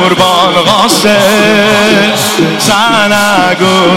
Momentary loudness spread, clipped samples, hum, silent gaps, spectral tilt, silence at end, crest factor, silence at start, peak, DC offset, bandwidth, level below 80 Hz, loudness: 2 LU; 0.7%; none; none; -3.5 dB/octave; 0 s; 8 dB; 0 s; 0 dBFS; under 0.1%; 17 kHz; -42 dBFS; -6 LUFS